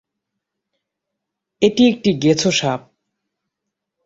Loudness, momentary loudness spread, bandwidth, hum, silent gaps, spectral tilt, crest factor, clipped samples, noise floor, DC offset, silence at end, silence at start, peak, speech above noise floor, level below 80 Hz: -16 LUFS; 8 LU; 8 kHz; none; none; -4.5 dB/octave; 20 dB; under 0.1%; -80 dBFS; under 0.1%; 1.3 s; 1.6 s; -2 dBFS; 65 dB; -56 dBFS